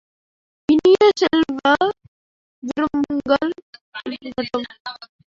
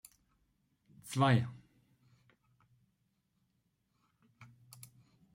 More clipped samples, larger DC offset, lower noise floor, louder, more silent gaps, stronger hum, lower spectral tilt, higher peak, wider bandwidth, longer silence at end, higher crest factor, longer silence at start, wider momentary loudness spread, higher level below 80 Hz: neither; neither; first, under -90 dBFS vs -79 dBFS; first, -19 LUFS vs -33 LUFS; first, 2.08-2.62 s, 3.62-3.73 s, 3.81-3.92 s, 4.80-4.85 s vs none; neither; second, -4.5 dB/octave vs -6 dB/octave; first, -4 dBFS vs -18 dBFS; second, 7.6 kHz vs 16 kHz; second, 0.25 s vs 0.9 s; second, 16 dB vs 24 dB; second, 0.7 s vs 1.05 s; second, 20 LU vs 26 LU; first, -56 dBFS vs -74 dBFS